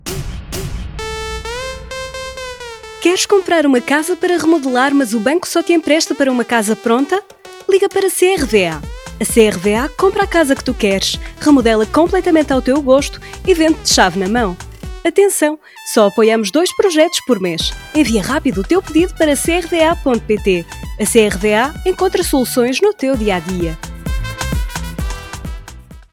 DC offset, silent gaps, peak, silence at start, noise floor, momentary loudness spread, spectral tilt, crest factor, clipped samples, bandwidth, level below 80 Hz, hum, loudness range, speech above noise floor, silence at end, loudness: under 0.1%; none; 0 dBFS; 0.05 s; -36 dBFS; 13 LU; -4 dB/octave; 14 dB; under 0.1%; 18 kHz; -30 dBFS; none; 3 LU; 22 dB; 0.1 s; -14 LUFS